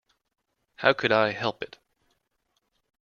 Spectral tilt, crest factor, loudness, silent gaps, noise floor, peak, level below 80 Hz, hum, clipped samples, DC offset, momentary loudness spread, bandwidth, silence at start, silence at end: -5.5 dB/octave; 26 dB; -24 LUFS; none; -76 dBFS; -4 dBFS; -68 dBFS; none; under 0.1%; under 0.1%; 17 LU; 7.2 kHz; 0.8 s; 1.35 s